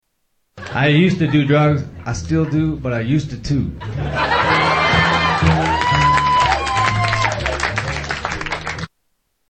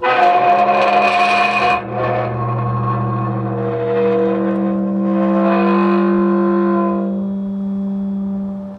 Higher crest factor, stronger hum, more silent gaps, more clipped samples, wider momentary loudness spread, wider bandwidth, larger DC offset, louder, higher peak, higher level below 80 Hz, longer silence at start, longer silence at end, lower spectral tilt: about the same, 16 dB vs 12 dB; neither; neither; neither; first, 11 LU vs 8 LU; about the same, 8.8 kHz vs 9.4 kHz; neither; about the same, -17 LUFS vs -16 LUFS; about the same, 0 dBFS vs -2 dBFS; first, -34 dBFS vs -50 dBFS; first, 0.55 s vs 0 s; first, 0.6 s vs 0 s; second, -5.5 dB/octave vs -7.5 dB/octave